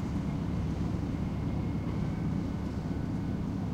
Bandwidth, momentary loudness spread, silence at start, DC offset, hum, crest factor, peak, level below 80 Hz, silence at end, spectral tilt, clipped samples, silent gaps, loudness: 9.8 kHz; 2 LU; 0 s; under 0.1%; none; 12 dB; -20 dBFS; -40 dBFS; 0 s; -8.5 dB/octave; under 0.1%; none; -34 LUFS